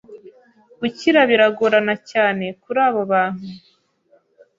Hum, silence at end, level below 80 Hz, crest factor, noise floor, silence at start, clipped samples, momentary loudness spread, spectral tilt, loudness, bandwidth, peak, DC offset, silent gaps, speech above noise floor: none; 1 s; -66 dBFS; 18 dB; -59 dBFS; 0.1 s; under 0.1%; 12 LU; -5.5 dB/octave; -18 LUFS; 7.6 kHz; -2 dBFS; under 0.1%; none; 41 dB